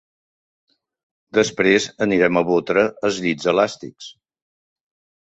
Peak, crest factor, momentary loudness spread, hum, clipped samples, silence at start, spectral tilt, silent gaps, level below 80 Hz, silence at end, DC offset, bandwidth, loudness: -2 dBFS; 20 dB; 17 LU; none; under 0.1%; 1.35 s; -4.5 dB/octave; none; -58 dBFS; 1.1 s; under 0.1%; 8.2 kHz; -19 LUFS